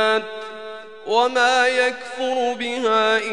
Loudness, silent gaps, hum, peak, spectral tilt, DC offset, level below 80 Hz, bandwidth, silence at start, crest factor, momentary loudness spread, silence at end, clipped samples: -19 LUFS; none; none; -4 dBFS; -1.5 dB/octave; 0.4%; -70 dBFS; 10.5 kHz; 0 s; 16 dB; 17 LU; 0 s; under 0.1%